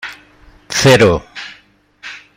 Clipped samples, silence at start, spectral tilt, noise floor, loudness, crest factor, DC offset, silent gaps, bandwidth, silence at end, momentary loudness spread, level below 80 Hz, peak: under 0.1%; 0.05 s; -4.5 dB/octave; -45 dBFS; -11 LUFS; 16 dB; under 0.1%; none; 16 kHz; 0.2 s; 23 LU; -40 dBFS; 0 dBFS